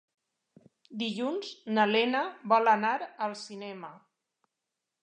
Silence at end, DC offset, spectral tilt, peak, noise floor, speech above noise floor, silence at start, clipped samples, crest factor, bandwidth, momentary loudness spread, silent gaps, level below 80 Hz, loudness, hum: 1.05 s; under 0.1%; -4.5 dB/octave; -10 dBFS; -87 dBFS; 57 dB; 0.9 s; under 0.1%; 22 dB; 9.8 kHz; 17 LU; none; -86 dBFS; -28 LUFS; none